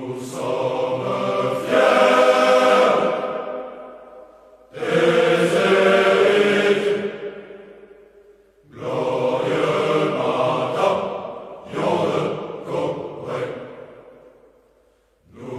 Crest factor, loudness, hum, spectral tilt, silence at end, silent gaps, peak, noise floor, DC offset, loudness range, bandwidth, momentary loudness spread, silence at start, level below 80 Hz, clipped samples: 18 dB; -19 LUFS; none; -5 dB/octave; 0 s; none; -4 dBFS; -59 dBFS; under 0.1%; 9 LU; 13.5 kHz; 18 LU; 0 s; -62 dBFS; under 0.1%